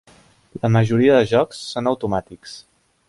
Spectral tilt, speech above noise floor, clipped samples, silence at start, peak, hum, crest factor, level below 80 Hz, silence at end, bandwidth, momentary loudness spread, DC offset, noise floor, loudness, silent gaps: -7 dB/octave; 34 dB; under 0.1%; 0.55 s; -4 dBFS; none; 16 dB; -52 dBFS; 0.5 s; 11.5 kHz; 23 LU; under 0.1%; -52 dBFS; -19 LUFS; none